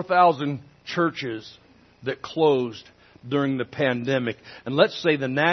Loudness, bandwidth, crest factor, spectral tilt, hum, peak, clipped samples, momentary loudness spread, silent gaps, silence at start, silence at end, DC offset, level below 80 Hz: -24 LUFS; 6.4 kHz; 20 dB; -6.5 dB/octave; none; -4 dBFS; under 0.1%; 13 LU; none; 0 s; 0 s; under 0.1%; -66 dBFS